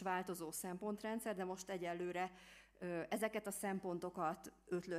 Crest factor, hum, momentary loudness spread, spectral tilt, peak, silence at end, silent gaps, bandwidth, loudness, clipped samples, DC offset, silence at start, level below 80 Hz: 18 dB; none; 6 LU; -4.5 dB/octave; -28 dBFS; 0 s; none; 15.5 kHz; -44 LUFS; under 0.1%; under 0.1%; 0 s; -76 dBFS